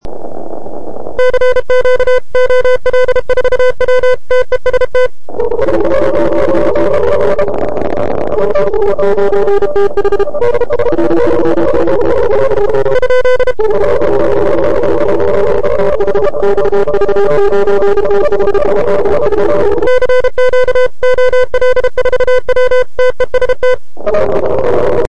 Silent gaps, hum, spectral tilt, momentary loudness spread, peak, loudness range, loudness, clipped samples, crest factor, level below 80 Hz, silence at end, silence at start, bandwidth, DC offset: none; none; -6.5 dB/octave; 4 LU; 0 dBFS; 2 LU; -11 LUFS; 0.4%; 8 dB; -28 dBFS; 0 s; 0 s; 10 kHz; 30%